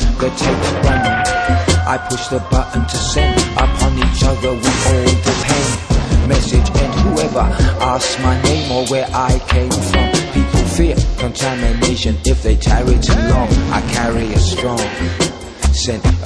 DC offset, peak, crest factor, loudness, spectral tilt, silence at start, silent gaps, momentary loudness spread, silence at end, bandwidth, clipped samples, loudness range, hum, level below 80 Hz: under 0.1%; 0 dBFS; 14 dB; -15 LUFS; -5 dB/octave; 0 s; none; 4 LU; 0 s; 11 kHz; under 0.1%; 1 LU; none; -18 dBFS